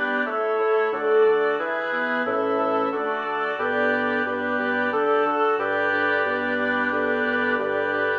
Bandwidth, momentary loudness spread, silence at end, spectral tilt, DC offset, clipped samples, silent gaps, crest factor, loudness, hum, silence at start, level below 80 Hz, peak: 6.4 kHz; 4 LU; 0 s; -6 dB/octave; under 0.1%; under 0.1%; none; 12 dB; -22 LUFS; none; 0 s; -72 dBFS; -10 dBFS